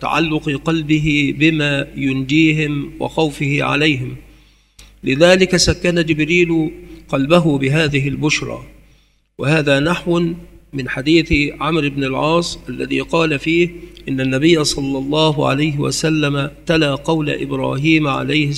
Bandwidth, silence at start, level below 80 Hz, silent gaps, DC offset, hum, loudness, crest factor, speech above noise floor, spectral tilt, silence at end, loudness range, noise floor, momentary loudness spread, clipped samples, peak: 13 kHz; 0 s; -38 dBFS; none; under 0.1%; none; -16 LUFS; 16 dB; 37 dB; -5 dB/octave; 0 s; 3 LU; -53 dBFS; 9 LU; under 0.1%; 0 dBFS